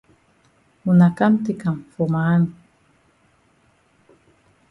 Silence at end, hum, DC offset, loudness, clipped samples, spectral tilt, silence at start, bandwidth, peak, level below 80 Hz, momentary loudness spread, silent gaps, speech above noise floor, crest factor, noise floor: 2.2 s; none; under 0.1%; -19 LUFS; under 0.1%; -9.5 dB/octave; 0.85 s; 4.3 kHz; -4 dBFS; -60 dBFS; 10 LU; none; 42 dB; 18 dB; -60 dBFS